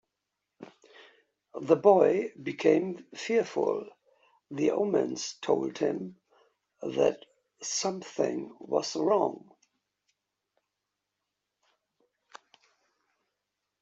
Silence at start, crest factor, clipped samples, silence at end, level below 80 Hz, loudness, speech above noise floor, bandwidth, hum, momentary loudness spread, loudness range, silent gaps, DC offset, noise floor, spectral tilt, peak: 0.6 s; 24 dB; under 0.1%; 4.45 s; -78 dBFS; -28 LUFS; 58 dB; 8 kHz; none; 17 LU; 6 LU; none; under 0.1%; -85 dBFS; -4.5 dB/octave; -8 dBFS